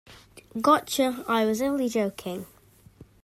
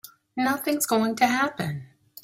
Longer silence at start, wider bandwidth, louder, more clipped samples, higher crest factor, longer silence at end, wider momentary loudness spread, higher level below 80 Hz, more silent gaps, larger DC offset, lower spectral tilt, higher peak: about the same, 0.1 s vs 0.05 s; about the same, 16 kHz vs 16 kHz; about the same, -25 LUFS vs -24 LUFS; neither; about the same, 18 dB vs 18 dB; second, 0.2 s vs 0.4 s; first, 16 LU vs 12 LU; about the same, -62 dBFS vs -66 dBFS; neither; neither; about the same, -4 dB/octave vs -4 dB/octave; about the same, -8 dBFS vs -8 dBFS